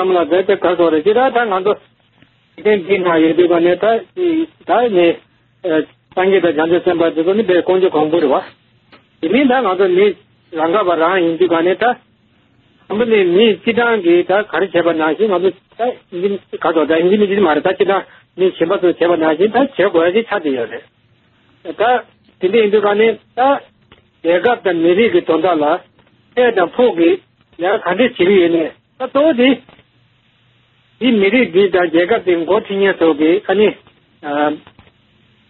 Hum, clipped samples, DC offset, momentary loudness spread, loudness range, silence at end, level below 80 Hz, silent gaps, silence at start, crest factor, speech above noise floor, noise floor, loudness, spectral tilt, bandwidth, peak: none; under 0.1%; under 0.1%; 9 LU; 2 LU; 0.9 s; -58 dBFS; none; 0 s; 14 dB; 41 dB; -55 dBFS; -14 LUFS; -3.5 dB/octave; 4.2 kHz; 0 dBFS